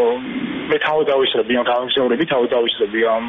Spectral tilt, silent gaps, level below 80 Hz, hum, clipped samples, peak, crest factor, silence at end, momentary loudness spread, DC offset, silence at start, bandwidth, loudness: -1.5 dB/octave; none; -56 dBFS; none; under 0.1%; -6 dBFS; 12 dB; 0 s; 5 LU; under 0.1%; 0 s; 4 kHz; -18 LUFS